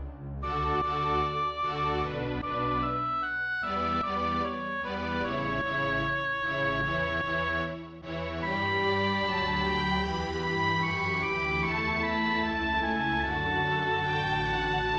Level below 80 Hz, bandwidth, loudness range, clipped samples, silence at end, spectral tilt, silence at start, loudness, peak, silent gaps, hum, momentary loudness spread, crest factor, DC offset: -44 dBFS; 8.6 kHz; 2 LU; under 0.1%; 0 s; -6 dB/octave; 0 s; -29 LUFS; -16 dBFS; none; none; 5 LU; 14 dB; 0.1%